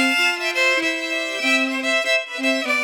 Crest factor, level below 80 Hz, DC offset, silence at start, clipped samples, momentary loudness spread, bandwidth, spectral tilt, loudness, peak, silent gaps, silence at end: 14 dB; -88 dBFS; under 0.1%; 0 s; under 0.1%; 4 LU; 19.5 kHz; 0 dB/octave; -19 LUFS; -6 dBFS; none; 0 s